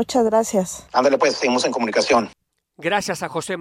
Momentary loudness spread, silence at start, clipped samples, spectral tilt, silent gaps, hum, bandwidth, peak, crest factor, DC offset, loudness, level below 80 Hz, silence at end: 8 LU; 0 s; under 0.1%; -3.5 dB/octave; none; none; 16 kHz; -4 dBFS; 16 dB; under 0.1%; -20 LUFS; -56 dBFS; 0 s